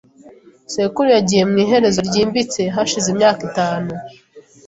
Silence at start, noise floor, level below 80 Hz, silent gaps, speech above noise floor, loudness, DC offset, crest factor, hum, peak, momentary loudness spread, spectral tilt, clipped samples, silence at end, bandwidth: 0.25 s; -44 dBFS; -52 dBFS; none; 28 dB; -16 LUFS; under 0.1%; 16 dB; none; -2 dBFS; 9 LU; -4.5 dB/octave; under 0.1%; 0.3 s; 8 kHz